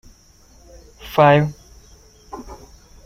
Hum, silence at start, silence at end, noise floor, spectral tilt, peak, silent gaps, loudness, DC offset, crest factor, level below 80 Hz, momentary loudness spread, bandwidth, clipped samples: none; 1.05 s; 0.5 s; -50 dBFS; -7 dB/octave; -2 dBFS; none; -16 LUFS; under 0.1%; 20 dB; -46 dBFS; 26 LU; 16 kHz; under 0.1%